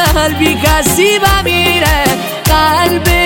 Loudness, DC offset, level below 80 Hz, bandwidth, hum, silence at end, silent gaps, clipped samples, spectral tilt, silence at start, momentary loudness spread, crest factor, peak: -10 LUFS; under 0.1%; -20 dBFS; 17 kHz; none; 0 s; none; under 0.1%; -3.5 dB/octave; 0 s; 3 LU; 10 dB; 0 dBFS